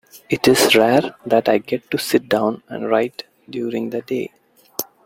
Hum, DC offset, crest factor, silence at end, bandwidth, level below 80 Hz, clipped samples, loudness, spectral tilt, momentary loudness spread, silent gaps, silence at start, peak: none; under 0.1%; 18 dB; 0.25 s; 16.5 kHz; -58 dBFS; under 0.1%; -18 LUFS; -4 dB/octave; 16 LU; none; 0.15 s; -2 dBFS